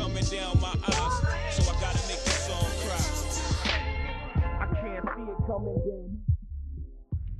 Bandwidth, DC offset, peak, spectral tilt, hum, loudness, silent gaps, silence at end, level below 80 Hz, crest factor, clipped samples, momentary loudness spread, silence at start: 13.5 kHz; under 0.1%; -12 dBFS; -4.5 dB/octave; none; -30 LUFS; none; 0 s; -34 dBFS; 16 dB; under 0.1%; 8 LU; 0 s